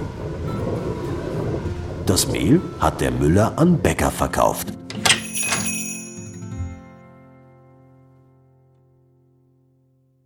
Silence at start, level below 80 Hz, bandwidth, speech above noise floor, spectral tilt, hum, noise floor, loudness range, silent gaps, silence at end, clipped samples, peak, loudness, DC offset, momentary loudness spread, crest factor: 0 s; -40 dBFS; 19.5 kHz; 42 dB; -4.5 dB/octave; none; -60 dBFS; 17 LU; none; 3.15 s; under 0.1%; -2 dBFS; -21 LUFS; under 0.1%; 15 LU; 22 dB